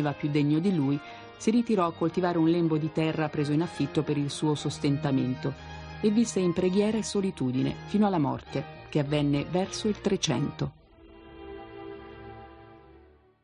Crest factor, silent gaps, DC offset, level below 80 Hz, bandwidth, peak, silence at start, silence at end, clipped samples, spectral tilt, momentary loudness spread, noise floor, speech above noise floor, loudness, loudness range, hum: 16 dB; none; under 0.1%; -54 dBFS; 11 kHz; -12 dBFS; 0 s; 0.65 s; under 0.1%; -6 dB/octave; 18 LU; -57 dBFS; 30 dB; -28 LUFS; 5 LU; none